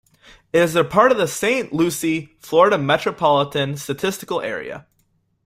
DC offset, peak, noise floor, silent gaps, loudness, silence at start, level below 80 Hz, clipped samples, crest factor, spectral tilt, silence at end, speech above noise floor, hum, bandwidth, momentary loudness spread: under 0.1%; -2 dBFS; -65 dBFS; none; -19 LUFS; 0.55 s; -58 dBFS; under 0.1%; 18 dB; -4.5 dB/octave; 0.65 s; 46 dB; none; 16 kHz; 10 LU